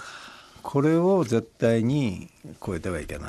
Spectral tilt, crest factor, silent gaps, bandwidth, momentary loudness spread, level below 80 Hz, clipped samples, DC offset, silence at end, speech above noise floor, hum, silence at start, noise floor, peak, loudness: -7 dB/octave; 16 dB; none; 13 kHz; 20 LU; -50 dBFS; under 0.1%; under 0.1%; 0 s; 21 dB; none; 0 s; -45 dBFS; -10 dBFS; -24 LUFS